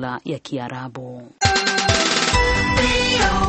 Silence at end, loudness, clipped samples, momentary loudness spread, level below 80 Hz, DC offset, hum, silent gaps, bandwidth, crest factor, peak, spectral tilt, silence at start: 0 s; -18 LUFS; under 0.1%; 15 LU; -30 dBFS; under 0.1%; none; none; 8.8 kHz; 18 dB; 0 dBFS; -3 dB/octave; 0 s